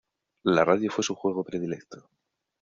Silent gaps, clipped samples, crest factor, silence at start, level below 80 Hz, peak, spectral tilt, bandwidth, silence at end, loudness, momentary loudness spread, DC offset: none; under 0.1%; 22 dB; 0.45 s; -68 dBFS; -6 dBFS; -4.5 dB/octave; 7.8 kHz; 0.6 s; -26 LUFS; 11 LU; under 0.1%